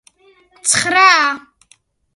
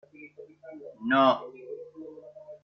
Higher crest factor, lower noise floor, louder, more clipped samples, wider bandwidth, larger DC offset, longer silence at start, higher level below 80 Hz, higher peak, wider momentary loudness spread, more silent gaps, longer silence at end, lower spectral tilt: about the same, 16 dB vs 20 dB; first, -55 dBFS vs -49 dBFS; first, -12 LUFS vs -25 LUFS; neither; first, 12 kHz vs 6.2 kHz; neither; first, 0.65 s vs 0.2 s; first, -60 dBFS vs -76 dBFS; first, 0 dBFS vs -10 dBFS; second, 11 LU vs 26 LU; neither; first, 0.75 s vs 0.1 s; second, 0 dB/octave vs -2.5 dB/octave